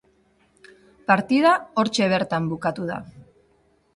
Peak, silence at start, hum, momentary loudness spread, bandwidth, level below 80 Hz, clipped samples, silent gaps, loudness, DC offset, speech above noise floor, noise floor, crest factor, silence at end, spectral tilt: -4 dBFS; 1.1 s; none; 13 LU; 11.5 kHz; -60 dBFS; under 0.1%; none; -21 LUFS; under 0.1%; 41 dB; -62 dBFS; 20 dB; 0.75 s; -5.5 dB/octave